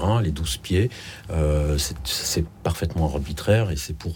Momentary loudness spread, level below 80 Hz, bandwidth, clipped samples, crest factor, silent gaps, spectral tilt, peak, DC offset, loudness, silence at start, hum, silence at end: 6 LU; -32 dBFS; 19 kHz; under 0.1%; 18 dB; none; -5 dB/octave; -6 dBFS; under 0.1%; -24 LUFS; 0 s; none; 0 s